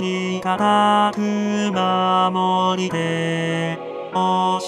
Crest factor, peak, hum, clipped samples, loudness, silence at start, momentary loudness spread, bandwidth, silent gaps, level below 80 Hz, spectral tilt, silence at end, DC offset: 14 dB; -6 dBFS; none; under 0.1%; -19 LUFS; 0 s; 6 LU; 11 kHz; none; -64 dBFS; -5.5 dB/octave; 0 s; under 0.1%